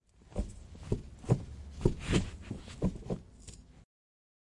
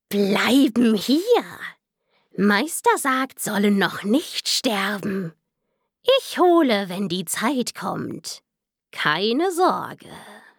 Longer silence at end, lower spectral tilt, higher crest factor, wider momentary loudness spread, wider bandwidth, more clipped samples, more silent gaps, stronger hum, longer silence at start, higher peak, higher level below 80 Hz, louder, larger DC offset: first, 0.6 s vs 0.2 s; first, -6.5 dB/octave vs -4 dB/octave; first, 26 dB vs 18 dB; about the same, 18 LU vs 17 LU; second, 11.5 kHz vs 19.5 kHz; neither; neither; neither; first, 0.25 s vs 0.1 s; second, -10 dBFS vs -2 dBFS; first, -44 dBFS vs -72 dBFS; second, -37 LUFS vs -21 LUFS; neither